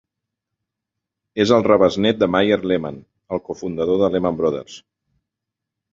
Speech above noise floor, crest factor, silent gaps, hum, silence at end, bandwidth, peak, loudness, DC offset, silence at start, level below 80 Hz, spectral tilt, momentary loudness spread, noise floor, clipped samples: 65 dB; 20 dB; none; none; 1.15 s; 7.6 kHz; -2 dBFS; -18 LUFS; under 0.1%; 1.35 s; -52 dBFS; -6 dB/octave; 14 LU; -83 dBFS; under 0.1%